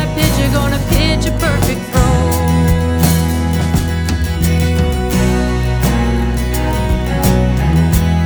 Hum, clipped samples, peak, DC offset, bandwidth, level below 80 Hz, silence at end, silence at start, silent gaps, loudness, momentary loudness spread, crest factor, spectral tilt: none; under 0.1%; 0 dBFS; under 0.1%; over 20 kHz; -18 dBFS; 0 s; 0 s; none; -14 LUFS; 4 LU; 12 dB; -5.5 dB/octave